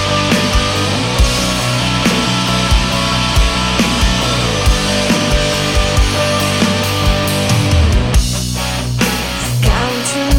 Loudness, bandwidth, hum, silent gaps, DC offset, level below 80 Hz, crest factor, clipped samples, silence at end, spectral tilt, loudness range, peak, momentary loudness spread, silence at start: -14 LUFS; 16.5 kHz; none; none; under 0.1%; -20 dBFS; 12 dB; under 0.1%; 0 s; -4 dB/octave; 1 LU; -2 dBFS; 3 LU; 0 s